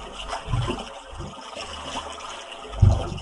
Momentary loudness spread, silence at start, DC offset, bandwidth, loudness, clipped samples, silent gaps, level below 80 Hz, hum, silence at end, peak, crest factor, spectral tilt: 16 LU; 0 s; under 0.1%; 11.5 kHz; -28 LUFS; under 0.1%; none; -32 dBFS; none; 0 s; -4 dBFS; 22 dB; -5.5 dB/octave